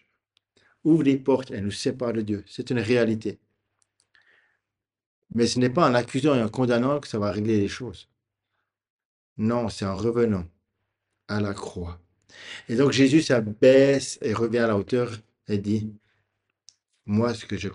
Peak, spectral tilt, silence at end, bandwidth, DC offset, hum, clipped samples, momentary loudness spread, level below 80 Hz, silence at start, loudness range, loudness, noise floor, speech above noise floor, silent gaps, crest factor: -6 dBFS; -6 dB/octave; 0 s; 11 kHz; under 0.1%; none; under 0.1%; 14 LU; -58 dBFS; 0.85 s; 8 LU; -24 LUFS; -85 dBFS; 62 dB; 5.06-5.22 s, 8.90-8.99 s, 9.05-9.36 s; 20 dB